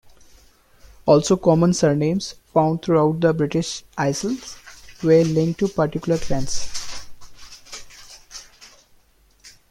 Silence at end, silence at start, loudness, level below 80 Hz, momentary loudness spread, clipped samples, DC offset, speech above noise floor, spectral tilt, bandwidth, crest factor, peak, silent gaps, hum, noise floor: 0.2 s; 1.05 s; -20 LUFS; -44 dBFS; 21 LU; under 0.1%; under 0.1%; 38 dB; -6 dB/octave; 14 kHz; 18 dB; -2 dBFS; none; none; -56 dBFS